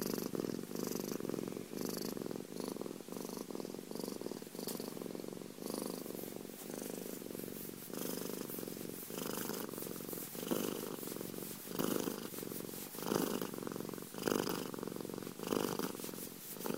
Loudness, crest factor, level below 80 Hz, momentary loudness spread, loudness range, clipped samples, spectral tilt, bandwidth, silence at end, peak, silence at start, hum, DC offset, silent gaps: -42 LUFS; 24 dB; -76 dBFS; 8 LU; 5 LU; under 0.1%; -4 dB/octave; 16 kHz; 0 s; -20 dBFS; 0 s; none; under 0.1%; none